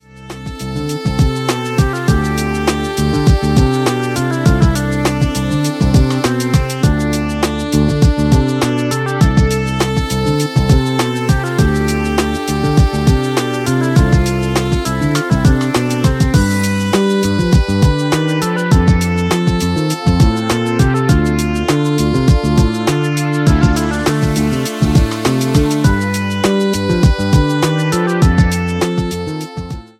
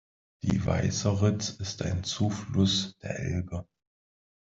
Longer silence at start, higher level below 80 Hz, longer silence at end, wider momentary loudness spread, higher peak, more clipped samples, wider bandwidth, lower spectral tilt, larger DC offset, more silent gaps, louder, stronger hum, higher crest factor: second, 0.15 s vs 0.45 s; first, -22 dBFS vs -52 dBFS; second, 0.15 s vs 0.95 s; second, 4 LU vs 9 LU; first, 0 dBFS vs -12 dBFS; neither; first, 16 kHz vs 7.8 kHz; about the same, -6 dB/octave vs -5 dB/octave; neither; neither; first, -14 LUFS vs -29 LUFS; neither; second, 12 dB vs 18 dB